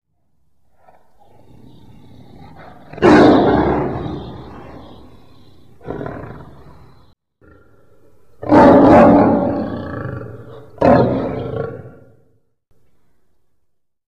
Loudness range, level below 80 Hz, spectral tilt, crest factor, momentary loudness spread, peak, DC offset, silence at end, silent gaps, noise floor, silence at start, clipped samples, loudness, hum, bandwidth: 22 LU; -40 dBFS; -8 dB/octave; 16 dB; 27 LU; -2 dBFS; 0.7%; 2.2 s; none; -66 dBFS; 2.95 s; under 0.1%; -13 LUFS; none; 8.4 kHz